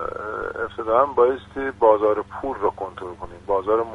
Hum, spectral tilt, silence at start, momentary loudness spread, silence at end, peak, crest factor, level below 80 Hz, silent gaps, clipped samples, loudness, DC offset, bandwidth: none; -7 dB/octave; 0 s; 15 LU; 0 s; -2 dBFS; 20 dB; -48 dBFS; none; under 0.1%; -22 LUFS; under 0.1%; 9.6 kHz